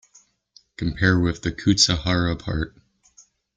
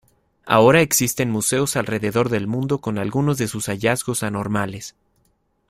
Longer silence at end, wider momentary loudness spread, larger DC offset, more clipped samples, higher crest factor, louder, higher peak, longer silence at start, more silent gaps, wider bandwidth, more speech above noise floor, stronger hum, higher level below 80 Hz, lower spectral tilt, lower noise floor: about the same, 0.9 s vs 0.8 s; about the same, 12 LU vs 10 LU; neither; neither; about the same, 20 dB vs 20 dB; about the same, -21 LUFS vs -20 LUFS; about the same, -4 dBFS vs -2 dBFS; first, 0.8 s vs 0.45 s; neither; second, 9.4 kHz vs 16 kHz; second, 36 dB vs 45 dB; neither; first, -40 dBFS vs -52 dBFS; about the same, -4 dB/octave vs -4.5 dB/octave; second, -58 dBFS vs -65 dBFS